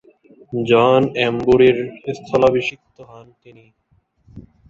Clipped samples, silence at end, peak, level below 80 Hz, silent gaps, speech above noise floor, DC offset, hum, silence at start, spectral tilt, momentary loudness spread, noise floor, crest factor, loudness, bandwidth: under 0.1%; 0.3 s; -2 dBFS; -50 dBFS; none; 44 dB; under 0.1%; none; 0.5 s; -6.5 dB/octave; 14 LU; -61 dBFS; 16 dB; -16 LUFS; 7.4 kHz